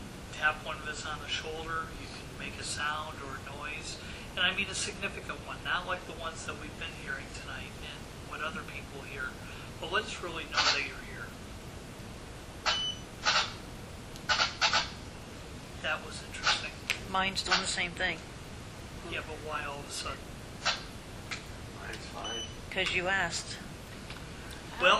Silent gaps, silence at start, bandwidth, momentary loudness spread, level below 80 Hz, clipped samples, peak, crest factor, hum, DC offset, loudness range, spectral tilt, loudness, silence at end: none; 0 s; 15.5 kHz; 17 LU; -50 dBFS; under 0.1%; -12 dBFS; 24 dB; none; under 0.1%; 7 LU; -2 dB/octave; -34 LUFS; 0 s